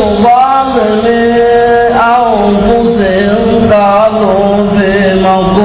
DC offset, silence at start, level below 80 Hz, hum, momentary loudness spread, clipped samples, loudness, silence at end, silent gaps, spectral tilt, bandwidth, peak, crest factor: under 0.1%; 0 s; -28 dBFS; none; 2 LU; under 0.1%; -8 LUFS; 0 s; none; -10.5 dB/octave; 4 kHz; 0 dBFS; 8 dB